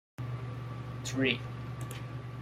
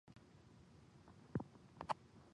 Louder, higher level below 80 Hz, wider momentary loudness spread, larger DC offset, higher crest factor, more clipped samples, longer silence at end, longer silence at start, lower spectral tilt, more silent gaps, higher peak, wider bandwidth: first, -36 LUFS vs -50 LUFS; first, -56 dBFS vs -70 dBFS; second, 11 LU vs 18 LU; neither; second, 22 dB vs 28 dB; neither; about the same, 0 s vs 0 s; first, 0.2 s vs 0.05 s; second, -5 dB/octave vs -7 dB/octave; neither; first, -14 dBFS vs -24 dBFS; first, 15 kHz vs 10.5 kHz